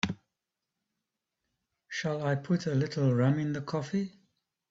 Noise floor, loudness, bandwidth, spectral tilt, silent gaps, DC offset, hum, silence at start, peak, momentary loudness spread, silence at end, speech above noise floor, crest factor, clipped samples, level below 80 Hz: -87 dBFS; -31 LUFS; 7.8 kHz; -7 dB/octave; none; under 0.1%; none; 0.05 s; -14 dBFS; 10 LU; 0.6 s; 58 dB; 20 dB; under 0.1%; -66 dBFS